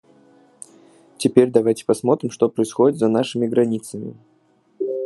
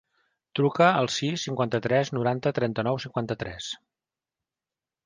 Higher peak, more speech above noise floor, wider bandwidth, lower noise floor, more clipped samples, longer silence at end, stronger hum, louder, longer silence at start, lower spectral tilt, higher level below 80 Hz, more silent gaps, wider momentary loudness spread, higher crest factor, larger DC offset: first, 0 dBFS vs -8 dBFS; second, 41 dB vs over 64 dB; first, 12 kHz vs 10 kHz; second, -59 dBFS vs under -90 dBFS; neither; second, 0 s vs 1.3 s; neither; first, -19 LUFS vs -26 LUFS; first, 1.2 s vs 0.55 s; about the same, -6 dB/octave vs -5.5 dB/octave; second, -68 dBFS vs -60 dBFS; neither; about the same, 12 LU vs 13 LU; about the same, 20 dB vs 20 dB; neither